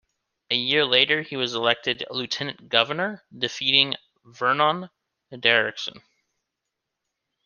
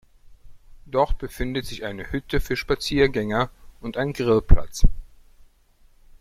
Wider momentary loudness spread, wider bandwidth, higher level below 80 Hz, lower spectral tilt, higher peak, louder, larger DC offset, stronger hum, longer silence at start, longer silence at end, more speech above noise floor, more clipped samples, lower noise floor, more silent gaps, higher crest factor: about the same, 11 LU vs 11 LU; second, 7.2 kHz vs 14 kHz; second, -72 dBFS vs -26 dBFS; second, -3.5 dB/octave vs -6 dB/octave; about the same, -2 dBFS vs 0 dBFS; first, -22 LUFS vs -25 LUFS; neither; neither; about the same, 0.5 s vs 0.45 s; first, 1.45 s vs 1.15 s; first, 59 dB vs 36 dB; neither; first, -83 dBFS vs -56 dBFS; neither; about the same, 24 dB vs 22 dB